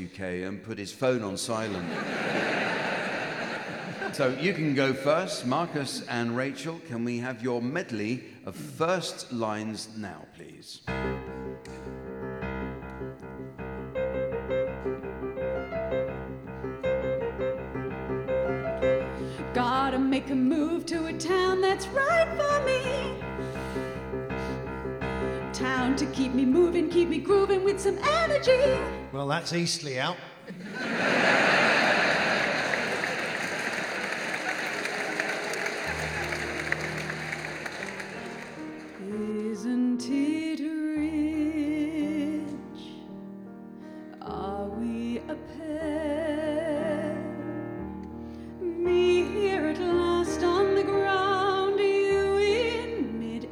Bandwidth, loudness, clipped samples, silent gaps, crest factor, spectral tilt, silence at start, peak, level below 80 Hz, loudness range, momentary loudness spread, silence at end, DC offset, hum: 15.5 kHz; -28 LUFS; under 0.1%; none; 18 dB; -5 dB/octave; 0 s; -10 dBFS; -50 dBFS; 9 LU; 15 LU; 0 s; under 0.1%; none